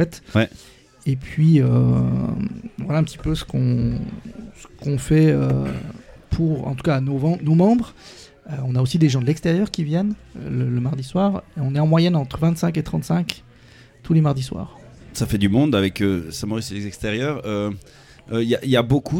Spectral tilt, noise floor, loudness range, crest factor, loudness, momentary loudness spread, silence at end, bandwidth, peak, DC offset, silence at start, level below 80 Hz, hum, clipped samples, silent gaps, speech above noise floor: -7 dB/octave; -48 dBFS; 3 LU; 20 dB; -21 LUFS; 14 LU; 0 s; 16 kHz; 0 dBFS; under 0.1%; 0 s; -42 dBFS; none; under 0.1%; none; 28 dB